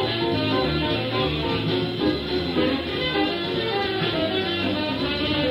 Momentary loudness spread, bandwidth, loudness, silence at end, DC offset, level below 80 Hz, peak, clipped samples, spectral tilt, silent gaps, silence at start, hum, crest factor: 2 LU; 16 kHz; -23 LUFS; 0 s; under 0.1%; -42 dBFS; -10 dBFS; under 0.1%; -7 dB/octave; none; 0 s; none; 14 dB